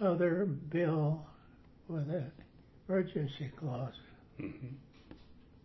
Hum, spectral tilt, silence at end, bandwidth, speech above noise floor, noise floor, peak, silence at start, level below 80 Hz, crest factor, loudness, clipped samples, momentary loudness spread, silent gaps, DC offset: none; -7.5 dB/octave; 0.25 s; 6 kHz; 23 dB; -60 dBFS; -20 dBFS; 0 s; -64 dBFS; 16 dB; -36 LUFS; under 0.1%; 25 LU; none; under 0.1%